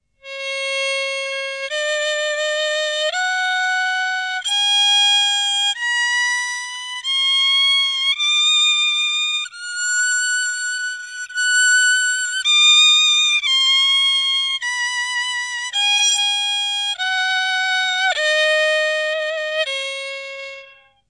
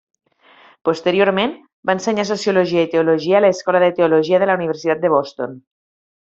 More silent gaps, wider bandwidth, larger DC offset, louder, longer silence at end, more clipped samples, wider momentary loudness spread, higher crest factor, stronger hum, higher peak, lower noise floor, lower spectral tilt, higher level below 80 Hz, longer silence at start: second, none vs 1.73-1.83 s; first, 11 kHz vs 7.8 kHz; neither; about the same, -16 LUFS vs -17 LUFS; second, 0.4 s vs 0.65 s; neither; about the same, 11 LU vs 9 LU; about the same, 14 dB vs 16 dB; neither; about the same, -4 dBFS vs -2 dBFS; second, -45 dBFS vs -49 dBFS; second, 6 dB/octave vs -5.5 dB/octave; second, -74 dBFS vs -62 dBFS; second, 0.25 s vs 0.85 s